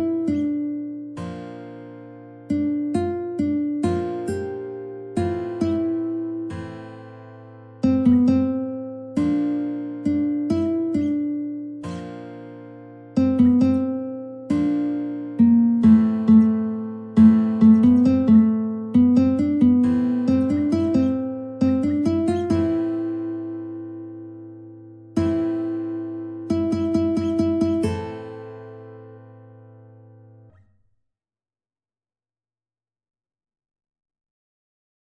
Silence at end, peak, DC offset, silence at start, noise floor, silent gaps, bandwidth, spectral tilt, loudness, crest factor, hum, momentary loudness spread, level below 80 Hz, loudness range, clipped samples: 5.7 s; -4 dBFS; under 0.1%; 0 s; under -90 dBFS; none; 9.8 kHz; -9 dB/octave; -21 LUFS; 18 dB; none; 21 LU; -54 dBFS; 11 LU; under 0.1%